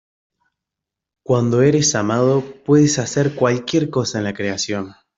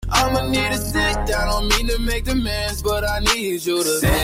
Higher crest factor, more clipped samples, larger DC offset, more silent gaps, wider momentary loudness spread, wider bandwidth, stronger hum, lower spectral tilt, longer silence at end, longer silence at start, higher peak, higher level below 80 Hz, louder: about the same, 16 dB vs 16 dB; neither; neither; neither; first, 8 LU vs 4 LU; second, 8 kHz vs 16.5 kHz; neither; first, -5 dB/octave vs -3.5 dB/octave; first, 0.25 s vs 0 s; first, 1.3 s vs 0 s; about the same, -2 dBFS vs -4 dBFS; second, -56 dBFS vs -26 dBFS; about the same, -18 LUFS vs -20 LUFS